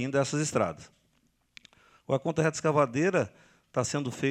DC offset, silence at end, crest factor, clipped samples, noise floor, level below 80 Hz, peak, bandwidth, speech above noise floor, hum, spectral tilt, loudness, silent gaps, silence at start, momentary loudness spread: under 0.1%; 0 s; 20 dB; under 0.1%; -71 dBFS; -66 dBFS; -10 dBFS; 13.5 kHz; 43 dB; none; -5.5 dB/octave; -29 LUFS; none; 0 s; 7 LU